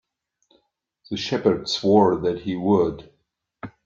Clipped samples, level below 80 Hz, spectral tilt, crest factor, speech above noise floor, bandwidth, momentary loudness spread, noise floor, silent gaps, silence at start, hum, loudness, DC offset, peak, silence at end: under 0.1%; -56 dBFS; -6 dB/octave; 20 dB; 51 dB; 7.6 kHz; 21 LU; -71 dBFS; none; 1.1 s; none; -21 LUFS; under 0.1%; -4 dBFS; 0.15 s